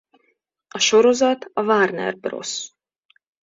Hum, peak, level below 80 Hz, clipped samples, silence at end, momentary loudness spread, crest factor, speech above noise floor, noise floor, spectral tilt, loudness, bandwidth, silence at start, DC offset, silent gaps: none; -4 dBFS; -68 dBFS; under 0.1%; 0.75 s; 14 LU; 18 dB; 49 dB; -68 dBFS; -2.5 dB/octave; -19 LUFS; 7.8 kHz; 0.75 s; under 0.1%; none